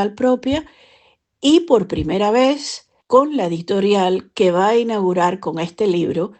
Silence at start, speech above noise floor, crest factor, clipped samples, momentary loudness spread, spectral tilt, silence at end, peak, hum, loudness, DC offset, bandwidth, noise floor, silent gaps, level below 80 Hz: 0 s; 39 dB; 16 dB; under 0.1%; 9 LU; -5.5 dB/octave; 0.05 s; 0 dBFS; none; -17 LUFS; under 0.1%; 9 kHz; -56 dBFS; none; -48 dBFS